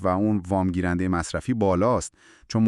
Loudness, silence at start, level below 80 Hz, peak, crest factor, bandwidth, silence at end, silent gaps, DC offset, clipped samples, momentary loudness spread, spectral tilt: -24 LUFS; 0 s; -46 dBFS; -10 dBFS; 14 dB; 11.5 kHz; 0 s; none; under 0.1%; under 0.1%; 6 LU; -6.5 dB/octave